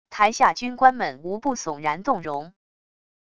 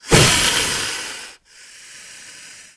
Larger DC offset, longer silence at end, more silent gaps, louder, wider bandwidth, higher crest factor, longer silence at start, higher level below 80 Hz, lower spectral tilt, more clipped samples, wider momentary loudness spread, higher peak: first, 0.5% vs under 0.1%; first, 0.75 s vs 0.15 s; neither; second, -22 LUFS vs -15 LUFS; second, 9.8 kHz vs 11 kHz; about the same, 22 dB vs 20 dB; about the same, 0.1 s vs 0.05 s; second, -60 dBFS vs -36 dBFS; about the same, -3.5 dB/octave vs -2.5 dB/octave; neither; second, 10 LU vs 25 LU; about the same, -2 dBFS vs 0 dBFS